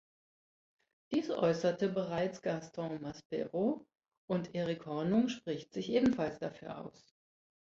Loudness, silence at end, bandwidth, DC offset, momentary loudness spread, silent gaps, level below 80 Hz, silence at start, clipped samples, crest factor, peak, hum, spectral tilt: -35 LUFS; 0.85 s; 7.6 kHz; under 0.1%; 12 LU; 3.25-3.30 s, 4.17-4.28 s; -70 dBFS; 1.1 s; under 0.1%; 18 dB; -18 dBFS; none; -6.5 dB/octave